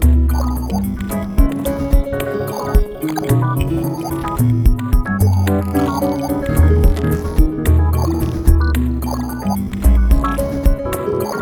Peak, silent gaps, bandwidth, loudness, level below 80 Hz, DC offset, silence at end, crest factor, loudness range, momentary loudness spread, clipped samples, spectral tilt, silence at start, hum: 0 dBFS; none; 19 kHz; -17 LUFS; -18 dBFS; under 0.1%; 0 s; 14 dB; 3 LU; 6 LU; under 0.1%; -7.5 dB/octave; 0 s; none